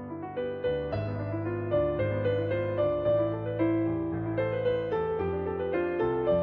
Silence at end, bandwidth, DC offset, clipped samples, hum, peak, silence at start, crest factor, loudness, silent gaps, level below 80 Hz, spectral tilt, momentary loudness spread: 0 s; 5 kHz; under 0.1%; under 0.1%; none; -16 dBFS; 0 s; 14 dB; -30 LUFS; none; -52 dBFS; -10.5 dB/octave; 5 LU